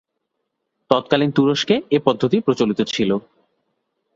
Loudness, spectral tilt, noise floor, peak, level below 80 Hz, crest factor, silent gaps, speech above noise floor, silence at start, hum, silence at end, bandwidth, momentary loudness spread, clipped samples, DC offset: -19 LUFS; -6 dB/octave; -76 dBFS; -2 dBFS; -60 dBFS; 18 dB; none; 58 dB; 0.9 s; none; 0.95 s; 7.8 kHz; 4 LU; under 0.1%; under 0.1%